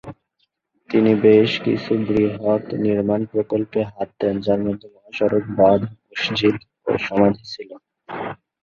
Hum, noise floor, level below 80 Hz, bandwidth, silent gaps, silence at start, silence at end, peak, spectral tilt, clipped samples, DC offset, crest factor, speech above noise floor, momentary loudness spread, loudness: none; -70 dBFS; -52 dBFS; 7 kHz; none; 0.05 s; 0.3 s; -2 dBFS; -7.5 dB/octave; under 0.1%; under 0.1%; 18 dB; 51 dB; 15 LU; -20 LUFS